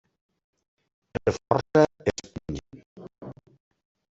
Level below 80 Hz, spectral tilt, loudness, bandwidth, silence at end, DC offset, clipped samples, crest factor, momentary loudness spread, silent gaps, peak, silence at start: -54 dBFS; -6 dB/octave; -26 LUFS; 8 kHz; 0.85 s; under 0.1%; under 0.1%; 26 dB; 23 LU; 2.86-2.96 s; -4 dBFS; 1.25 s